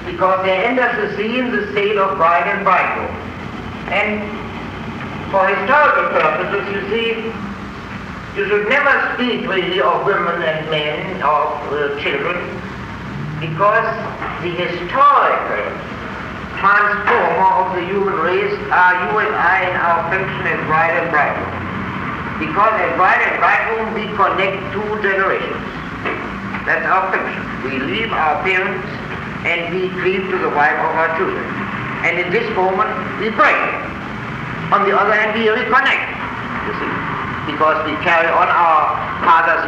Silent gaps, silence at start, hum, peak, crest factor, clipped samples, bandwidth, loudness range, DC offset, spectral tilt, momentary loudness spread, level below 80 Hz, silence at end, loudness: none; 0 s; none; -2 dBFS; 14 dB; under 0.1%; 9.4 kHz; 4 LU; under 0.1%; -6 dB/octave; 13 LU; -44 dBFS; 0 s; -16 LUFS